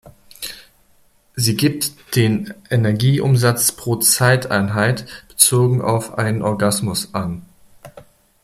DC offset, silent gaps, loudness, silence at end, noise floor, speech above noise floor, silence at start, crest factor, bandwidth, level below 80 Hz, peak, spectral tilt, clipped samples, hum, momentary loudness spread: under 0.1%; none; -17 LUFS; 0.4 s; -55 dBFS; 38 dB; 0.4 s; 18 dB; 16 kHz; -50 dBFS; 0 dBFS; -4 dB/octave; under 0.1%; none; 15 LU